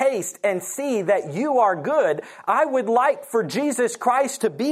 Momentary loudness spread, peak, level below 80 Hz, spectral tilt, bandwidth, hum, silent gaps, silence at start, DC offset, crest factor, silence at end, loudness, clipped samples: 5 LU; -6 dBFS; -78 dBFS; -4.5 dB/octave; 15.5 kHz; none; none; 0 s; under 0.1%; 16 dB; 0 s; -22 LUFS; under 0.1%